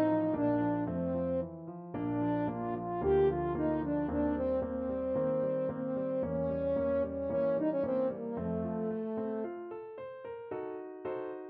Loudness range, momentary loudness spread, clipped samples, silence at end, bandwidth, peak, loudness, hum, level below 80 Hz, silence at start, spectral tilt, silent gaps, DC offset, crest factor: 4 LU; 11 LU; under 0.1%; 0 s; 4.3 kHz; -18 dBFS; -34 LUFS; none; -54 dBFS; 0 s; -8.5 dB/octave; none; under 0.1%; 14 dB